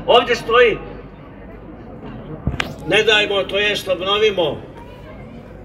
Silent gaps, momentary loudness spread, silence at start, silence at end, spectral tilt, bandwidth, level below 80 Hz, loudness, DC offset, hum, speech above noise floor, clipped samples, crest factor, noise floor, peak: none; 23 LU; 0 s; 0 s; -4 dB/octave; 14 kHz; -40 dBFS; -16 LUFS; under 0.1%; none; 21 dB; under 0.1%; 20 dB; -37 dBFS; 0 dBFS